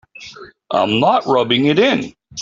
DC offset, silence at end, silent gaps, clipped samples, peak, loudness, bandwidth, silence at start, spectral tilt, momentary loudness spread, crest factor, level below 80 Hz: under 0.1%; 0 s; none; under 0.1%; -2 dBFS; -15 LUFS; 7.6 kHz; 0.2 s; -5 dB/octave; 21 LU; 14 dB; -56 dBFS